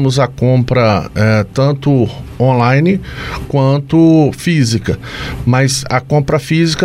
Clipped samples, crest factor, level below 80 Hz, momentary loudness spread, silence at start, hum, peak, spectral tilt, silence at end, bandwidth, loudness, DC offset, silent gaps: under 0.1%; 12 dB; -34 dBFS; 8 LU; 0 s; none; 0 dBFS; -6.5 dB/octave; 0 s; 13.5 kHz; -13 LUFS; under 0.1%; none